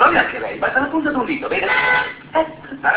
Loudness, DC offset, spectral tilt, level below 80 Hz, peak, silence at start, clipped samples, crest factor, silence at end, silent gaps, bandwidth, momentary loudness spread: -18 LUFS; under 0.1%; -7.5 dB/octave; -50 dBFS; 0 dBFS; 0 s; under 0.1%; 18 dB; 0 s; none; 4 kHz; 7 LU